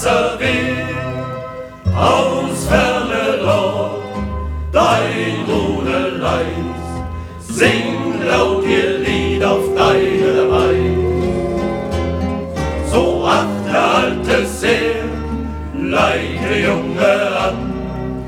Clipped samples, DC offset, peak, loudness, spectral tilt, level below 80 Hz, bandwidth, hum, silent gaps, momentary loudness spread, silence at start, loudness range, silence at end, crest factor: under 0.1%; under 0.1%; 0 dBFS; -16 LUFS; -5.5 dB/octave; -30 dBFS; 17 kHz; none; none; 10 LU; 0 s; 3 LU; 0 s; 16 dB